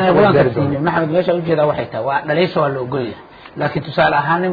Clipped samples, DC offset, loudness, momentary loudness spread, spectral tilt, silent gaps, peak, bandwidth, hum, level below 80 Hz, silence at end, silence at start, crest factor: under 0.1%; under 0.1%; -16 LUFS; 10 LU; -9.5 dB/octave; none; -2 dBFS; 5 kHz; none; -48 dBFS; 0 s; 0 s; 14 dB